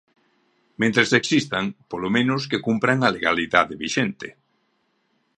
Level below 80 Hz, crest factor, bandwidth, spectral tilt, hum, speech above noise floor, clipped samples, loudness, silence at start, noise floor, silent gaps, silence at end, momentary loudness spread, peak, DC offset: -58 dBFS; 22 dB; 11 kHz; -4.5 dB/octave; none; 47 dB; under 0.1%; -21 LUFS; 0.8 s; -69 dBFS; none; 1.1 s; 10 LU; 0 dBFS; under 0.1%